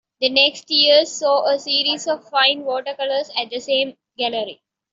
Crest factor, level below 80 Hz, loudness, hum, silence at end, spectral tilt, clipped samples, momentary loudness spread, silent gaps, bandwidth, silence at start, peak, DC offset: 18 dB; -72 dBFS; -18 LUFS; none; 0.4 s; -1 dB/octave; under 0.1%; 11 LU; none; 7.8 kHz; 0.2 s; -2 dBFS; under 0.1%